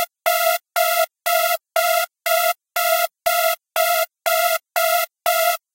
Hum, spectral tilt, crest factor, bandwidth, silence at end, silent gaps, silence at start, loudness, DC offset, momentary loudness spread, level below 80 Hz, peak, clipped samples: none; 3.5 dB/octave; 14 dB; 17 kHz; 0.15 s; none; 0 s; -19 LUFS; under 0.1%; 2 LU; -68 dBFS; -6 dBFS; under 0.1%